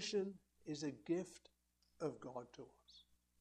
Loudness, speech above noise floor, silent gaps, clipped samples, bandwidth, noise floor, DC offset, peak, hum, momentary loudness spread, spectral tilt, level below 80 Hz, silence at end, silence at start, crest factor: -47 LUFS; 28 dB; none; under 0.1%; 12.5 kHz; -73 dBFS; under 0.1%; -30 dBFS; 60 Hz at -75 dBFS; 21 LU; -5 dB/octave; -80 dBFS; 0.4 s; 0 s; 18 dB